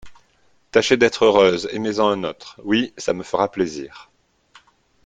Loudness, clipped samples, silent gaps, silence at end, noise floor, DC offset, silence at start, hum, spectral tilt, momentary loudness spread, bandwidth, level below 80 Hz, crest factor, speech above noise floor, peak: -19 LUFS; under 0.1%; none; 1.05 s; -60 dBFS; under 0.1%; 0.05 s; none; -4.5 dB/octave; 13 LU; 9.2 kHz; -56 dBFS; 20 dB; 41 dB; 0 dBFS